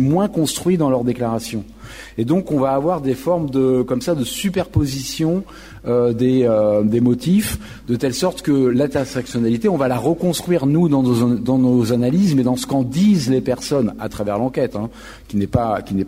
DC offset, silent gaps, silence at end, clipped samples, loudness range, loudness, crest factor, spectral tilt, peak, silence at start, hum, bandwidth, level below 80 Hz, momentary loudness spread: under 0.1%; none; 0 s; under 0.1%; 3 LU; -18 LUFS; 14 dB; -6.5 dB/octave; -4 dBFS; 0 s; none; 16 kHz; -42 dBFS; 9 LU